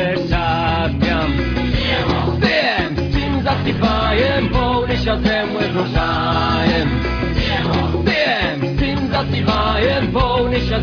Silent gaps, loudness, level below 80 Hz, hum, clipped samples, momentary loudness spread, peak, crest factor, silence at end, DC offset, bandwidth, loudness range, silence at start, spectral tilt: none; -17 LUFS; -26 dBFS; none; under 0.1%; 3 LU; -2 dBFS; 14 dB; 0 s; under 0.1%; 5.4 kHz; 1 LU; 0 s; -7 dB/octave